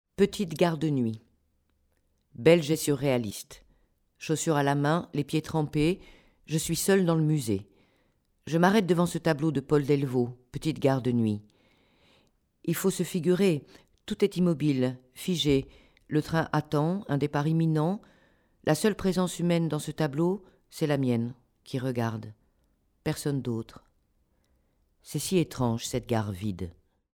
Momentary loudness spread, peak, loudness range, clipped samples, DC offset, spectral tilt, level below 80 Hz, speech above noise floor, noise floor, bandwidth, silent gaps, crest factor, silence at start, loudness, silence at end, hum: 12 LU; -6 dBFS; 6 LU; under 0.1%; under 0.1%; -6 dB/octave; -56 dBFS; 44 dB; -71 dBFS; 19 kHz; none; 22 dB; 0.2 s; -28 LUFS; 0.45 s; none